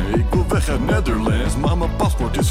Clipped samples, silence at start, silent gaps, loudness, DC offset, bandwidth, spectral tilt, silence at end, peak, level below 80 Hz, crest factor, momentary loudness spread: under 0.1%; 0 s; none; -19 LUFS; under 0.1%; 15.5 kHz; -6 dB/octave; 0 s; -6 dBFS; -22 dBFS; 10 dB; 1 LU